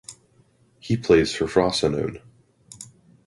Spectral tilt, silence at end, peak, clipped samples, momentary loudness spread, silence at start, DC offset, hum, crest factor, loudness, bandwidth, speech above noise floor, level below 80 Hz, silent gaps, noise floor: -5 dB/octave; 0.45 s; -4 dBFS; under 0.1%; 24 LU; 0.1 s; under 0.1%; none; 20 dB; -22 LUFS; 11.5 kHz; 39 dB; -48 dBFS; none; -60 dBFS